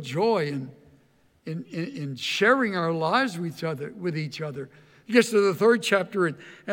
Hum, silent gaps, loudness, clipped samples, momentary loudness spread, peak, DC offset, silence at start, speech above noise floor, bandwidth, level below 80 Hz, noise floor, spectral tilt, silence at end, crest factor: none; none; -25 LUFS; under 0.1%; 16 LU; -6 dBFS; under 0.1%; 0 s; 37 dB; 17 kHz; -74 dBFS; -62 dBFS; -5 dB/octave; 0 s; 20 dB